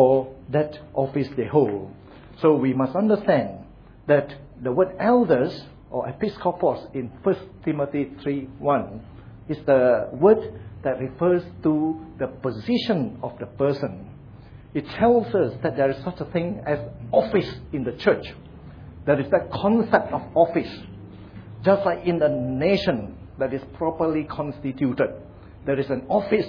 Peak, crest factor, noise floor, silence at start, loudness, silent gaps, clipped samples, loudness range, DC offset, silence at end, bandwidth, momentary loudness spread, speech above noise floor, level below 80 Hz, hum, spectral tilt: -2 dBFS; 20 dB; -44 dBFS; 0 s; -23 LUFS; none; under 0.1%; 4 LU; under 0.1%; 0 s; 5.4 kHz; 14 LU; 21 dB; -50 dBFS; none; -9 dB/octave